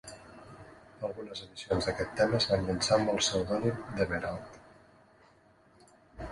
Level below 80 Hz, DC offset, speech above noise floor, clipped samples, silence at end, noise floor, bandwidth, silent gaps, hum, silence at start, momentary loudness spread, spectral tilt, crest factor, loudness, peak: -54 dBFS; under 0.1%; 32 dB; under 0.1%; 0 s; -62 dBFS; 11.5 kHz; none; none; 0.05 s; 23 LU; -4 dB/octave; 20 dB; -31 LUFS; -12 dBFS